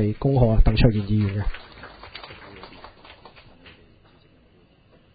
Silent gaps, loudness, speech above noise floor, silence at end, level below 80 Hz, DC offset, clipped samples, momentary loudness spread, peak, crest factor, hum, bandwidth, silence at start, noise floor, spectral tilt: none; -21 LUFS; 37 dB; 2.25 s; -30 dBFS; under 0.1%; under 0.1%; 24 LU; -2 dBFS; 22 dB; none; 5 kHz; 0 s; -56 dBFS; -12 dB/octave